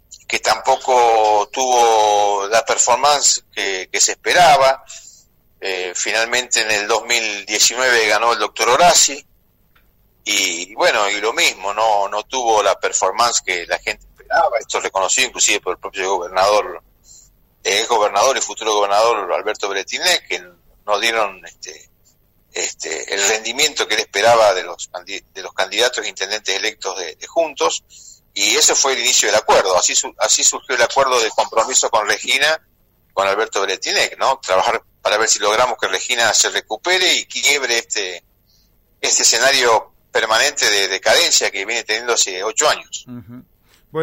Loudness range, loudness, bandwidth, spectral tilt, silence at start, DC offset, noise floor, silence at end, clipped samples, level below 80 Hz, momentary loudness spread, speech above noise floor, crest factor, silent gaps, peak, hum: 4 LU; -15 LUFS; 16 kHz; 0.5 dB/octave; 0.1 s; under 0.1%; -56 dBFS; 0 s; under 0.1%; -54 dBFS; 12 LU; 40 dB; 14 dB; none; -4 dBFS; none